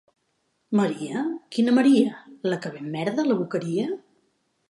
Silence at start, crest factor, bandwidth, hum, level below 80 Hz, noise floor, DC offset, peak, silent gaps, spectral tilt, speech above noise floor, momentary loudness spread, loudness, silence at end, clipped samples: 0.7 s; 18 dB; 11.5 kHz; none; -76 dBFS; -72 dBFS; under 0.1%; -6 dBFS; none; -6.5 dB/octave; 49 dB; 12 LU; -24 LUFS; 0.7 s; under 0.1%